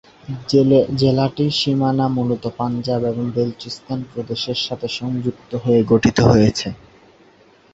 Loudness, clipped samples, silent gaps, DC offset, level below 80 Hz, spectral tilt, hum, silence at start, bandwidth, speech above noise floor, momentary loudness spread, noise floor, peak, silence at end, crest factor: -18 LUFS; under 0.1%; none; under 0.1%; -44 dBFS; -6.5 dB/octave; none; 0.3 s; 8 kHz; 33 dB; 13 LU; -51 dBFS; -2 dBFS; 1 s; 18 dB